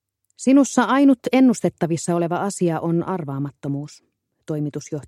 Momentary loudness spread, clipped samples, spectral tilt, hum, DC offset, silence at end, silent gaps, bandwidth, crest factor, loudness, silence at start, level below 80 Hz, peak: 13 LU; under 0.1%; -6 dB/octave; none; under 0.1%; 0.05 s; none; 12.5 kHz; 18 dB; -20 LUFS; 0.4 s; -66 dBFS; -2 dBFS